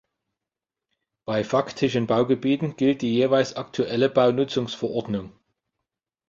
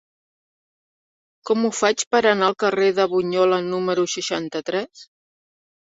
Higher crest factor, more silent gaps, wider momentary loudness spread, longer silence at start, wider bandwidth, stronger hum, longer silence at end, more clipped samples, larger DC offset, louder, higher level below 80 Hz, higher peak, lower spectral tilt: about the same, 18 dB vs 20 dB; second, none vs 2.07-2.11 s; about the same, 8 LU vs 8 LU; second, 1.3 s vs 1.45 s; about the same, 7.6 kHz vs 8 kHz; neither; first, 1 s vs 0.8 s; neither; neither; second, -23 LUFS vs -20 LUFS; about the same, -62 dBFS vs -66 dBFS; second, -6 dBFS vs -2 dBFS; first, -6.5 dB/octave vs -3.5 dB/octave